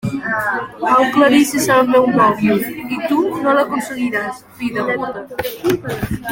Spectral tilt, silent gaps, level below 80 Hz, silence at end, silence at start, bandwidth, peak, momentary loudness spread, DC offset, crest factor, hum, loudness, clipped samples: -5 dB/octave; none; -46 dBFS; 0 s; 0.05 s; 17 kHz; -2 dBFS; 11 LU; under 0.1%; 14 dB; none; -16 LUFS; under 0.1%